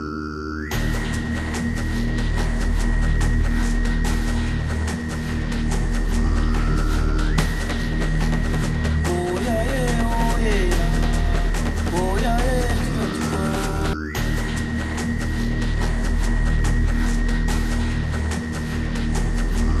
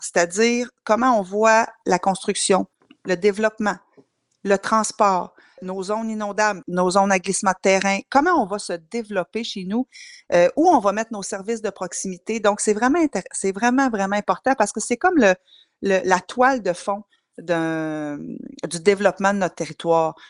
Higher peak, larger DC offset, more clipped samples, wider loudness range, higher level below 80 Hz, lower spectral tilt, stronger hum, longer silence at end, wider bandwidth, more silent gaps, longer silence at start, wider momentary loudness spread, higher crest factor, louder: second, -6 dBFS vs 0 dBFS; neither; neither; about the same, 2 LU vs 3 LU; first, -22 dBFS vs -60 dBFS; first, -5.5 dB/octave vs -4 dB/octave; neither; second, 0 s vs 0.2 s; first, 14 kHz vs 11.5 kHz; neither; about the same, 0 s vs 0 s; second, 3 LU vs 11 LU; second, 14 dB vs 20 dB; about the same, -23 LUFS vs -21 LUFS